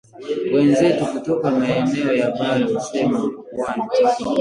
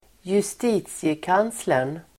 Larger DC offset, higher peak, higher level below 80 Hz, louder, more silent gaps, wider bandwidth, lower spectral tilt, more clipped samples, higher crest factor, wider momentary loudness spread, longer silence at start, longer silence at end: neither; first, -4 dBFS vs -8 dBFS; about the same, -56 dBFS vs -60 dBFS; first, -19 LUFS vs -24 LUFS; neither; second, 11 kHz vs 16.5 kHz; about the same, -6 dB/octave vs -5 dB/octave; neither; about the same, 14 dB vs 16 dB; first, 9 LU vs 4 LU; about the same, 0.15 s vs 0.25 s; second, 0 s vs 0.2 s